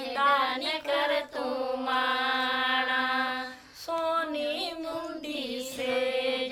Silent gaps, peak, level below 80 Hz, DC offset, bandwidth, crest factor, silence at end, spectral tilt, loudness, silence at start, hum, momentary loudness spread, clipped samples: none; -12 dBFS; -66 dBFS; under 0.1%; 16 kHz; 18 dB; 0 s; -2 dB/octave; -28 LUFS; 0 s; none; 10 LU; under 0.1%